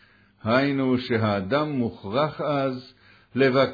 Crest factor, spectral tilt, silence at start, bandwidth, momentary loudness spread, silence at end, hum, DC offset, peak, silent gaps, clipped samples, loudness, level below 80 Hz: 18 dB; -8.5 dB/octave; 0.45 s; 5 kHz; 8 LU; 0 s; none; under 0.1%; -6 dBFS; none; under 0.1%; -24 LUFS; -62 dBFS